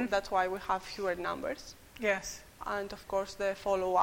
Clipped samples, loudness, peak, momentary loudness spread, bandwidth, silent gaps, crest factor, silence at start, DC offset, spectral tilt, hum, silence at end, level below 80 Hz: under 0.1%; -34 LUFS; -14 dBFS; 10 LU; 16.5 kHz; none; 20 dB; 0 s; under 0.1%; -3.5 dB/octave; none; 0 s; -58 dBFS